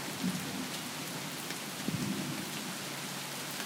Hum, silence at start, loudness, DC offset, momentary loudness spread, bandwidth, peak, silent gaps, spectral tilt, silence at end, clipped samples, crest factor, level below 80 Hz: none; 0 s; -37 LUFS; under 0.1%; 3 LU; 18 kHz; -18 dBFS; none; -3 dB/octave; 0 s; under 0.1%; 18 dB; -74 dBFS